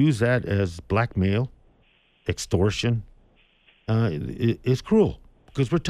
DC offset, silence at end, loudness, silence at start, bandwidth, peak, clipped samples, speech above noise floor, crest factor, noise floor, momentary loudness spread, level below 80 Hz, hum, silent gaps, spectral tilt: under 0.1%; 0 s; -24 LUFS; 0 s; 13 kHz; -8 dBFS; under 0.1%; 39 dB; 16 dB; -62 dBFS; 11 LU; -46 dBFS; none; none; -6.5 dB/octave